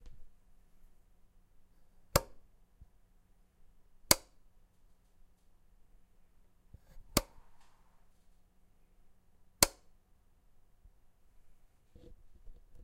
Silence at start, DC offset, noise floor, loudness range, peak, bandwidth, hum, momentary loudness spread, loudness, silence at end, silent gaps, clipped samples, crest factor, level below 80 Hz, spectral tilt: 0.05 s; under 0.1%; -66 dBFS; 7 LU; -4 dBFS; 16 kHz; none; 6 LU; -32 LUFS; 0.05 s; none; under 0.1%; 40 dB; -56 dBFS; -2 dB/octave